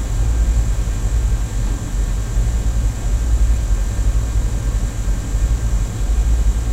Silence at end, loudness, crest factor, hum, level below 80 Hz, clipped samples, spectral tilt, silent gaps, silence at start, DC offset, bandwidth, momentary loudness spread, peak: 0 s; -21 LUFS; 12 dB; none; -18 dBFS; under 0.1%; -5.5 dB/octave; none; 0 s; under 0.1%; 13 kHz; 4 LU; -6 dBFS